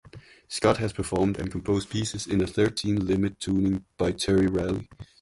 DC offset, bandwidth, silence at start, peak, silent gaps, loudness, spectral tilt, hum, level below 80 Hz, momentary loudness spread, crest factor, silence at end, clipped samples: under 0.1%; 11.5 kHz; 0.05 s; -8 dBFS; none; -26 LUFS; -5.5 dB/octave; none; -46 dBFS; 7 LU; 18 dB; 0.15 s; under 0.1%